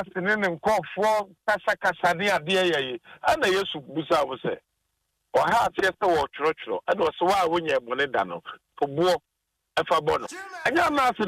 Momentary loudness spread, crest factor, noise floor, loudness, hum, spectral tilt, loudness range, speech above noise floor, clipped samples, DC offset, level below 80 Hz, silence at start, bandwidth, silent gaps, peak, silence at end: 9 LU; 14 dB; -77 dBFS; -25 LUFS; none; -4 dB/octave; 2 LU; 52 dB; under 0.1%; under 0.1%; -58 dBFS; 0 s; 15.5 kHz; none; -12 dBFS; 0 s